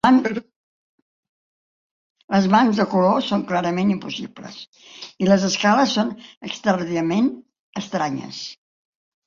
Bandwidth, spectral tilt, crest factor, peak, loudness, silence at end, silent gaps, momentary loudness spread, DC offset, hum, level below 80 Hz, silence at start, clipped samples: 7.4 kHz; -5.5 dB/octave; 20 dB; -2 dBFS; -20 LUFS; 0.75 s; 0.56-1.23 s, 1.29-2.15 s, 2.24-2.28 s, 4.67-4.73 s, 6.37-6.41 s, 7.60-7.73 s; 19 LU; under 0.1%; none; -62 dBFS; 0.05 s; under 0.1%